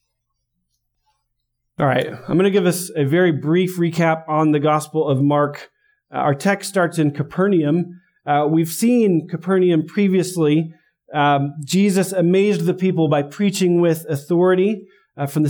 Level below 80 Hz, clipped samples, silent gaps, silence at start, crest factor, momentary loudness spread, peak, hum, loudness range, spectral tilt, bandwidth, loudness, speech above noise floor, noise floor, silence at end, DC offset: -64 dBFS; under 0.1%; none; 1.8 s; 14 dB; 6 LU; -4 dBFS; none; 2 LU; -6.5 dB/octave; over 20 kHz; -18 LUFS; 57 dB; -74 dBFS; 0 s; under 0.1%